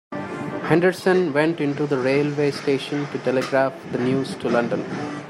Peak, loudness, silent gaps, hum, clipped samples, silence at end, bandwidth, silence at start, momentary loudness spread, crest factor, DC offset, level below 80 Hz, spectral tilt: -2 dBFS; -22 LUFS; none; none; under 0.1%; 0 s; 13 kHz; 0.1 s; 8 LU; 20 dB; under 0.1%; -64 dBFS; -6.5 dB/octave